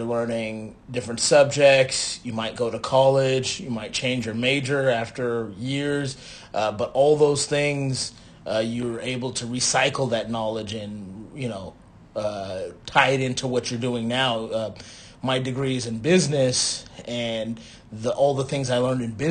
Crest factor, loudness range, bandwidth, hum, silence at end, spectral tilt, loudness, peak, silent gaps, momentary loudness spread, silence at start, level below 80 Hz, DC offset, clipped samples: 22 dB; 5 LU; 10 kHz; none; 0 s; -4 dB/octave; -23 LUFS; -2 dBFS; none; 14 LU; 0 s; -54 dBFS; under 0.1%; under 0.1%